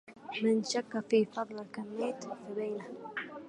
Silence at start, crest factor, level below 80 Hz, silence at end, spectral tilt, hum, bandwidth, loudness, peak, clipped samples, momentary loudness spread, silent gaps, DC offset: 0.05 s; 18 dB; -82 dBFS; 0 s; -4.5 dB/octave; none; 11 kHz; -35 LUFS; -16 dBFS; under 0.1%; 12 LU; none; under 0.1%